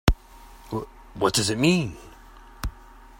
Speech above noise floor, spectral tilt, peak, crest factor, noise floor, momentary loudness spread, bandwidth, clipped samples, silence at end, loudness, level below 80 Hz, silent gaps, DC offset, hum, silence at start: 24 dB; -4.5 dB/octave; 0 dBFS; 26 dB; -47 dBFS; 16 LU; 16 kHz; under 0.1%; 0.4 s; -25 LUFS; -34 dBFS; none; under 0.1%; none; 0.05 s